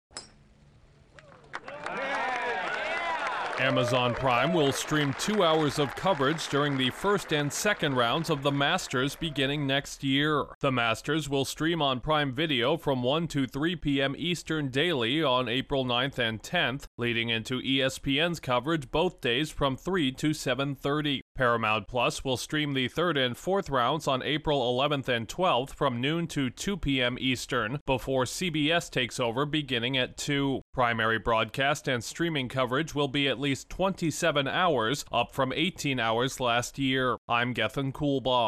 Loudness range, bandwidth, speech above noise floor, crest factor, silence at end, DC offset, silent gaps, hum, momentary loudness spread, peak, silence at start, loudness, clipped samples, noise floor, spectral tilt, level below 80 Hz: 2 LU; 14.5 kHz; 30 dB; 16 dB; 0 s; under 0.1%; 10.55-10.61 s, 16.87-16.98 s, 21.22-21.35 s, 27.81-27.86 s, 30.62-30.73 s, 37.18-37.28 s; none; 4 LU; -12 dBFS; 0.15 s; -28 LUFS; under 0.1%; -58 dBFS; -4.5 dB/octave; -52 dBFS